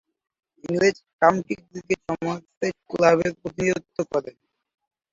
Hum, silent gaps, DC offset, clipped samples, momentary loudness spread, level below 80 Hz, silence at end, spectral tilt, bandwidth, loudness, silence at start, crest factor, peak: none; 1.13-1.19 s, 2.57-2.61 s; under 0.1%; under 0.1%; 11 LU; -60 dBFS; 0.85 s; -5.5 dB/octave; 7.8 kHz; -24 LUFS; 0.65 s; 22 dB; -2 dBFS